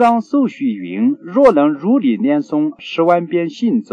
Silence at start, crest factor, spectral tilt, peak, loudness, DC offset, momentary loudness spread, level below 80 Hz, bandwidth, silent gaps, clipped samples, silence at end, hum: 0 s; 14 dB; -7.5 dB/octave; -2 dBFS; -15 LUFS; under 0.1%; 8 LU; -56 dBFS; 8.6 kHz; none; under 0.1%; 0.1 s; none